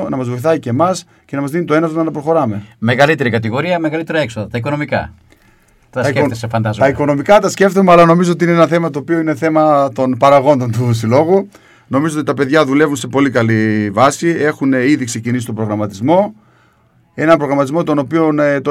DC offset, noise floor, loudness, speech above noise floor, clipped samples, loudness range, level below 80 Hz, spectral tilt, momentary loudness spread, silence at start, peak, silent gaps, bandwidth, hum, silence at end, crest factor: under 0.1%; -52 dBFS; -13 LUFS; 39 dB; 0.2%; 5 LU; -50 dBFS; -6.5 dB/octave; 9 LU; 0 s; 0 dBFS; none; 15 kHz; none; 0 s; 14 dB